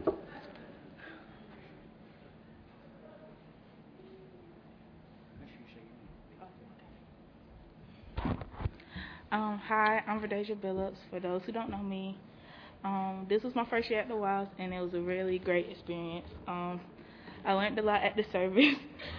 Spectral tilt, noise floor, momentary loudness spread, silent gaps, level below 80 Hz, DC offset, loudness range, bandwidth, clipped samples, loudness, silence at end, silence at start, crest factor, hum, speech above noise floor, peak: -3.5 dB/octave; -56 dBFS; 25 LU; none; -56 dBFS; under 0.1%; 21 LU; 5.4 kHz; under 0.1%; -34 LUFS; 0 s; 0 s; 26 dB; none; 23 dB; -10 dBFS